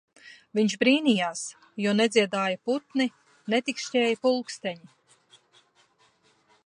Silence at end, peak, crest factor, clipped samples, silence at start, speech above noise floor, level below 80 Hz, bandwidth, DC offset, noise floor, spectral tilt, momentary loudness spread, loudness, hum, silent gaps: 1.9 s; -6 dBFS; 20 dB; under 0.1%; 0.25 s; 39 dB; -78 dBFS; 11 kHz; under 0.1%; -64 dBFS; -4 dB/octave; 13 LU; -26 LUFS; none; none